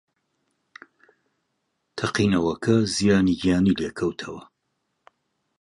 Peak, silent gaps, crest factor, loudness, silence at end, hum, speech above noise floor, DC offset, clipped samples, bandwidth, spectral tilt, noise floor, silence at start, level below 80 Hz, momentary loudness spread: -6 dBFS; none; 18 dB; -22 LUFS; 1.2 s; none; 54 dB; under 0.1%; under 0.1%; 11.5 kHz; -5.5 dB/octave; -76 dBFS; 1.95 s; -50 dBFS; 16 LU